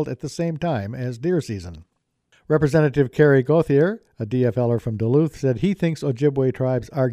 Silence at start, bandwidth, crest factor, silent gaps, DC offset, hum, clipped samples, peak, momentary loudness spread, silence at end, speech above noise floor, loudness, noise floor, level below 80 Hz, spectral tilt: 0 s; 12.5 kHz; 18 dB; none; under 0.1%; none; under 0.1%; -4 dBFS; 9 LU; 0 s; 43 dB; -21 LUFS; -63 dBFS; -50 dBFS; -8 dB/octave